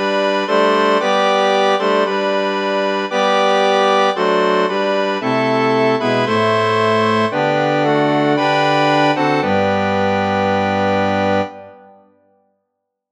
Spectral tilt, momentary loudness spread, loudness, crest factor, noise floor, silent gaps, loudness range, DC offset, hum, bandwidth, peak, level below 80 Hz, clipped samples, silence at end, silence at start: -5.5 dB/octave; 4 LU; -15 LUFS; 14 dB; -75 dBFS; none; 2 LU; under 0.1%; none; 10 kHz; -2 dBFS; -66 dBFS; under 0.1%; 1.35 s; 0 s